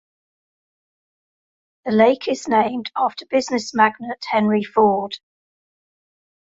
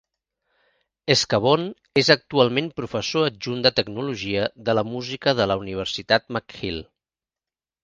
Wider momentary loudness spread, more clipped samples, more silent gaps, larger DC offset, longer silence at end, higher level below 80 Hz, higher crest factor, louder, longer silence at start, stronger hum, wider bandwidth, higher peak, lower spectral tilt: about the same, 10 LU vs 11 LU; neither; neither; neither; first, 1.3 s vs 1 s; second, -64 dBFS vs -54 dBFS; about the same, 20 dB vs 22 dB; first, -19 LUFS vs -22 LUFS; first, 1.85 s vs 1.05 s; neither; second, 7.8 kHz vs 10 kHz; about the same, -2 dBFS vs 0 dBFS; about the same, -5 dB/octave vs -4.5 dB/octave